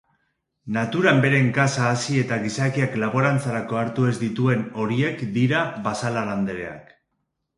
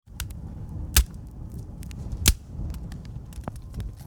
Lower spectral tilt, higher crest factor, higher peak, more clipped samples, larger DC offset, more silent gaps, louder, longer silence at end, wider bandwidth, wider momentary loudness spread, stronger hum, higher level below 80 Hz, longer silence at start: first, -6 dB/octave vs -3 dB/octave; second, 22 dB vs 28 dB; about the same, -2 dBFS vs -2 dBFS; neither; neither; neither; first, -22 LUFS vs -29 LUFS; first, 0.75 s vs 0 s; second, 11.5 kHz vs over 20 kHz; second, 8 LU vs 16 LU; neither; second, -58 dBFS vs -32 dBFS; first, 0.65 s vs 0.05 s